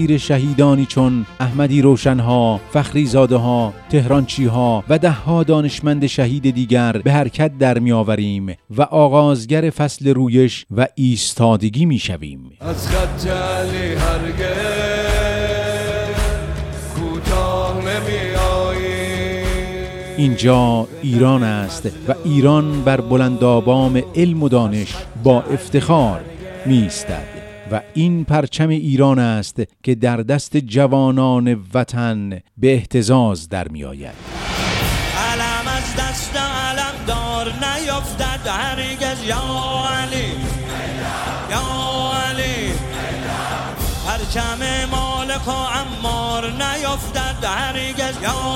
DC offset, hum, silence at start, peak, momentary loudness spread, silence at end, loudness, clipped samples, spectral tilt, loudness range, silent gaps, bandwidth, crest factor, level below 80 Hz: under 0.1%; none; 0 s; 0 dBFS; 10 LU; 0 s; -17 LUFS; under 0.1%; -6 dB/octave; 6 LU; none; 16.5 kHz; 16 dB; -30 dBFS